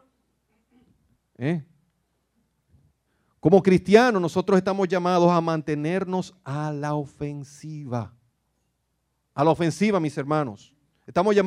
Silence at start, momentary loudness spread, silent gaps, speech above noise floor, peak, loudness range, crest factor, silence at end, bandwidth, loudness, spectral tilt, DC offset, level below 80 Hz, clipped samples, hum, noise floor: 1.4 s; 16 LU; none; 52 dB; -2 dBFS; 12 LU; 24 dB; 0 s; 11.5 kHz; -23 LUFS; -7 dB/octave; under 0.1%; -62 dBFS; under 0.1%; none; -74 dBFS